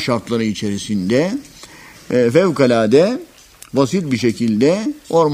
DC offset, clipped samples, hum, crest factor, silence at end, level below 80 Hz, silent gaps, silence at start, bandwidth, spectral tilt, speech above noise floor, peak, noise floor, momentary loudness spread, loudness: under 0.1%; under 0.1%; none; 16 dB; 0 s; -54 dBFS; none; 0 s; 15.5 kHz; -6 dB/octave; 24 dB; 0 dBFS; -40 dBFS; 8 LU; -16 LUFS